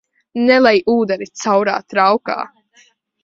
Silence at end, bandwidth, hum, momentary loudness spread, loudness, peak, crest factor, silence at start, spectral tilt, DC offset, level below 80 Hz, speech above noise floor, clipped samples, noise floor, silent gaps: 0.75 s; 7.8 kHz; none; 13 LU; -15 LUFS; 0 dBFS; 16 dB; 0.35 s; -4.5 dB/octave; under 0.1%; -60 dBFS; 39 dB; under 0.1%; -54 dBFS; none